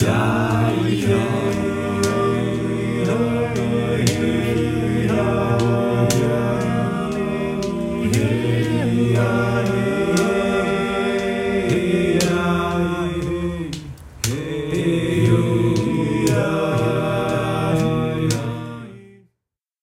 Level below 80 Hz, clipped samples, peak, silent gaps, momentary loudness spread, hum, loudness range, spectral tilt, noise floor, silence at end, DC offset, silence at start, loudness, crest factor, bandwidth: -42 dBFS; under 0.1%; 0 dBFS; none; 6 LU; none; 2 LU; -6 dB/octave; -81 dBFS; 0.75 s; under 0.1%; 0 s; -20 LUFS; 18 dB; 16 kHz